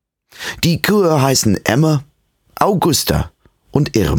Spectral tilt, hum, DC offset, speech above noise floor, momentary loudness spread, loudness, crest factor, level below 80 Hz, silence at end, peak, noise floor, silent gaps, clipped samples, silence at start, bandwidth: -5 dB/octave; none; under 0.1%; 26 dB; 9 LU; -15 LUFS; 16 dB; -34 dBFS; 0 s; 0 dBFS; -39 dBFS; none; under 0.1%; 0.4 s; 19.5 kHz